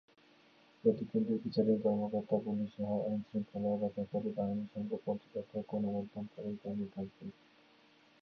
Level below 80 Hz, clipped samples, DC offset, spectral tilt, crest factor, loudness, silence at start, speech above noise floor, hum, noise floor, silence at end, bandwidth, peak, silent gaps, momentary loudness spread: -72 dBFS; under 0.1%; under 0.1%; -8.5 dB/octave; 20 dB; -37 LUFS; 0.85 s; 30 dB; none; -66 dBFS; 0.95 s; 5.8 kHz; -16 dBFS; none; 10 LU